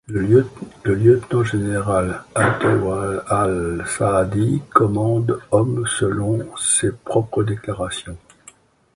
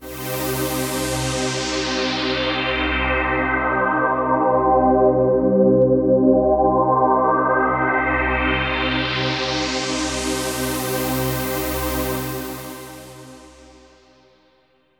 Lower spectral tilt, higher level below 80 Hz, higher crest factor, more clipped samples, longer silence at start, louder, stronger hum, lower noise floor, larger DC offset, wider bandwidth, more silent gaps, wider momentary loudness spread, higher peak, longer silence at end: about the same, -5.5 dB/octave vs -4.5 dB/octave; second, -42 dBFS vs -36 dBFS; about the same, 18 dB vs 16 dB; neither; about the same, 0.1 s vs 0 s; about the same, -19 LUFS vs -19 LUFS; second, none vs 50 Hz at -60 dBFS; second, -49 dBFS vs -60 dBFS; neither; second, 11.5 kHz vs over 20 kHz; neither; about the same, 9 LU vs 8 LU; first, 0 dBFS vs -4 dBFS; second, 0.8 s vs 1.5 s